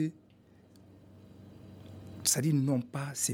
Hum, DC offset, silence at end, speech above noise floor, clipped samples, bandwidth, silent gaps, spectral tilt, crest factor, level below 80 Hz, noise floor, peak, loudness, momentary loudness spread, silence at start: none; under 0.1%; 0 s; 30 dB; under 0.1%; 17 kHz; none; -4 dB/octave; 22 dB; -70 dBFS; -60 dBFS; -12 dBFS; -30 LUFS; 25 LU; 0 s